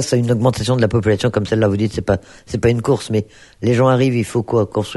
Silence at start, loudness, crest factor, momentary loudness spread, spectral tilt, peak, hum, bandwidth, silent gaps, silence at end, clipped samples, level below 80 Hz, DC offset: 0 s; -17 LUFS; 16 dB; 7 LU; -6.5 dB/octave; -2 dBFS; none; 12 kHz; none; 0 s; under 0.1%; -40 dBFS; under 0.1%